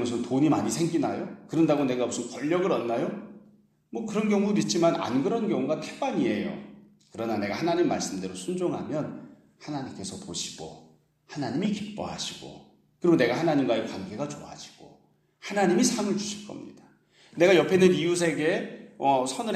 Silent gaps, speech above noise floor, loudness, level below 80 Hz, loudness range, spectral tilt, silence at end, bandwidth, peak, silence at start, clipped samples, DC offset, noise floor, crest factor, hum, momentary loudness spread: none; 36 dB; -27 LUFS; -68 dBFS; 9 LU; -5 dB/octave; 0 s; 13.5 kHz; -6 dBFS; 0 s; under 0.1%; under 0.1%; -62 dBFS; 20 dB; none; 19 LU